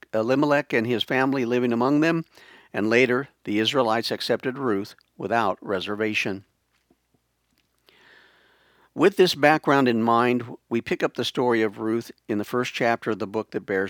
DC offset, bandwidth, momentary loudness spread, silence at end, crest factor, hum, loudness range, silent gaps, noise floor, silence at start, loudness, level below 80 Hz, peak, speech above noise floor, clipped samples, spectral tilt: under 0.1%; 19 kHz; 10 LU; 0 s; 22 dB; none; 7 LU; none; -70 dBFS; 0.15 s; -23 LUFS; -72 dBFS; -2 dBFS; 47 dB; under 0.1%; -5.5 dB/octave